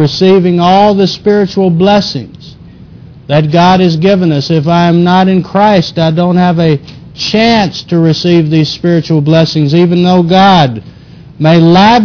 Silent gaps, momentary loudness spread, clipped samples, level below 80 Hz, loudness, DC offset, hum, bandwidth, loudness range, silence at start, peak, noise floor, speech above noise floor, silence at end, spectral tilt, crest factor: none; 6 LU; 0.7%; -40 dBFS; -8 LUFS; under 0.1%; none; 5.4 kHz; 2 LU; 0 s; 0 dBFS; -32 dBFS; 25 dB; 0 s; -7 dB/octave; 8 dB